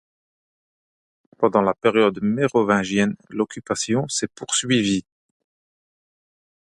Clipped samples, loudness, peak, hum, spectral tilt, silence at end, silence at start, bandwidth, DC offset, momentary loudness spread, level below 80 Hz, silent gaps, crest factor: under 0.1%; -21 LUFS; -2 dBFS; none; -4 dB/octave; 1.65 s; 1.4 s; 11.5 kHz; under 0.1%; 8 LU; -60 dBFS; none; 20 dB